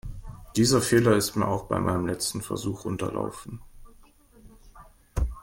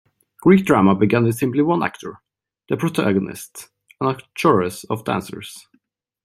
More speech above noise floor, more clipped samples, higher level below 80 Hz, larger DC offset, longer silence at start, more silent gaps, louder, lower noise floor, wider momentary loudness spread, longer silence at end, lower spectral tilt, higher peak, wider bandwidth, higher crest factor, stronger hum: second, 29 dB vs 45 dB; neither; first, -40 dBFS vs -58 dBFS; neither; second, 0.05 s vs 0.45 s; neither; second, -26 LUFS vs -19 LUFS; second, -54 dBFS vs -64 dBFS; about the same, 21 LU vs 19 LU; second, 0 s vs 0.65 s; second, -5 dB/octave vs -6.5 dB/octave; second, -6 dBFS vs -2 dBFS; first, 16.5 kHz vs 14 kHz; about the same, 20 dB vs 18 dB; neither